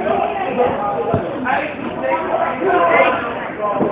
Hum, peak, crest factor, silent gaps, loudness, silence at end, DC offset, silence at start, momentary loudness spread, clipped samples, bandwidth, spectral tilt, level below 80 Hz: none; 0 dBFS; 16 dB; none; -18 LUFS; 0 s; under 0.1%; 0 s; 8 LU; under 0.1%; 4 kHz; -9.5 dB/octave; -46 dBFS